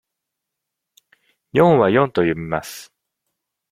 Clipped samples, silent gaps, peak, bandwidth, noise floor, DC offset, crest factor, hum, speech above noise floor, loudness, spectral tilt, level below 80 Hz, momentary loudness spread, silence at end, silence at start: under 0.1%; none; -2 dBFS; 16 kHz; -81 dBFS; under 0.1%; 20 dB; none; 65 dB; -17 LUFS; -6.5 dB/octave; -54 dBFS; 17 LU; 0.85 s; 1.55 s